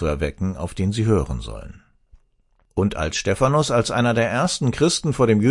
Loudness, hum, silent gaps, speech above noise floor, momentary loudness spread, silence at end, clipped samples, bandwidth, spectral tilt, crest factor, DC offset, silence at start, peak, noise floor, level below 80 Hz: -21 LUFS; none; none; 42 dB; 10 LU; 0 s; under 0.1%; 11.5 kHz; -5.5 dB/octave; 18 dB; under 0.1%; 0 s; -4 dBFS; -62 dBFS; -38 dBFS